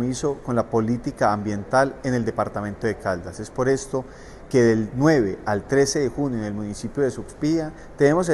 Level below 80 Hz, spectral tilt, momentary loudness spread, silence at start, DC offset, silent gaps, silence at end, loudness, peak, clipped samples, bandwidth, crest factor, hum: -46 dBFS; -6 dB/octave; 10 LU; 0 s; under 0.1%; none; 0 s; -23 LUFS; -4 dBFS; under 0.1%; 12.5 kHz; 18 dB; none